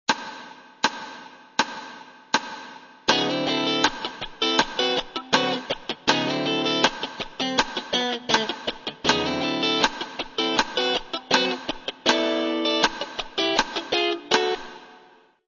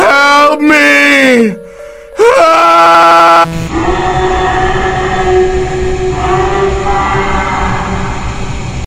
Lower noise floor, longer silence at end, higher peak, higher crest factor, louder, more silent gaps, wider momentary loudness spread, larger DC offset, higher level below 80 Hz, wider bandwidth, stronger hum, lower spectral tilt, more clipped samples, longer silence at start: first, -54 dBFS vs -29 dBFS; first, 0.5 s vs 0 s; about the same, -2 dBFS vs 0 dBFS; first, 24 dB vs 8 dB; second, -24 LUFS vs -8 LUFS; neither; about the same, 11 LU vs 12 LU; neither; second, -54 dBFS vs -22 dBFS; second, 7.4 kHz vs 19.5 kHz; neither; second, -2.5 dB/octave vs -5 dB/octave; second, under 0.1% vs 4%; about the same, 0.1 s vs 0 s